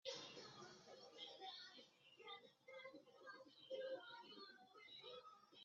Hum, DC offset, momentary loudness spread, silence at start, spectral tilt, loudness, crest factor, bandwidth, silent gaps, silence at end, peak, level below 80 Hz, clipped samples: none; under 0.1%; 10 LU; 0.05 s; -0.5 dB/octave; -58 LUFS; 22 dB; 7.4 kHz; none; 0 s; -38 dBFS; under -90 dBFS; under 0.1%